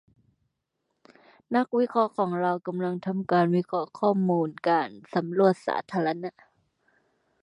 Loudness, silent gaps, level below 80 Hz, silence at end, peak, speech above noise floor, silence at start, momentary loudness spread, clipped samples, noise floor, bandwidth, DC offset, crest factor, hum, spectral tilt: -26 LUFS; none; -76 dBFS; 1.15 s; -8 dBFS; 54 dB; 1.5 s; 7 LU; under 0.1%; -79 dBFS; 10.5 kHz; under 0.1%; 20 dB; none; -8.5 dB/octave